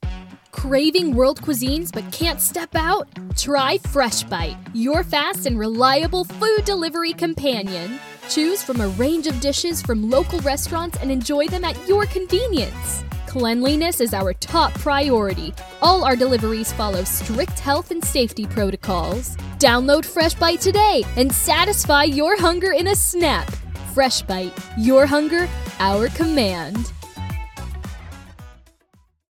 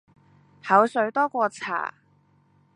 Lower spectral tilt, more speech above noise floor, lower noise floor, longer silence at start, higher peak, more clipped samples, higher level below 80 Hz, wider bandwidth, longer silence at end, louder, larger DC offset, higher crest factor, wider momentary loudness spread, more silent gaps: about the same, -4 dB/octave vs -5 dB/octave; about the same, 39 dB vs 39 dB; second, -58 dBFS vs -62 dBFS; second, 0 s vs 0.65 s; first, 0 dBFS vs -4 dBFS; neither; first, -34 dBFS vs -76 dBFS; first, 18 kHz vs 11 kHz; about the same, 0.8 s vs 0.9 s; first, -19 LUFS vs -23 LUFS; neither; about the same, 20 dB vs 22 dB; about the same, 12 LU vs 13 LU; neither